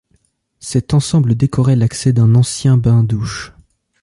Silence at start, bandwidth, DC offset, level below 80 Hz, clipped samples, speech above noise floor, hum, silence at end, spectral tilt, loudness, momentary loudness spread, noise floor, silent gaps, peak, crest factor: 0.65 s; 11.5 kHz; under 0.1%; -40 dBFS; under 0.1%; 47 dB; none; 0.55 s; -6.5 dB/octave; -14 LUFS; 12 LU; -60 dBFS; none; -2 dBFS; 12 dB